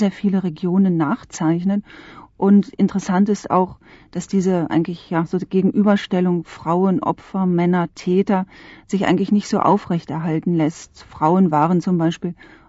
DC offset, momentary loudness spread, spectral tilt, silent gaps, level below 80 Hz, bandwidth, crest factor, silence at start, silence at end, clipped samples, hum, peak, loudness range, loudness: under 0.1%; 8 LU; -7.5 dB/octave; none; -54 dBFS; 8 kHz; 16 dB; 0 s; 0.35 s; under 0.1%; none; -4 dBFS; 1 LU; -19 LUFS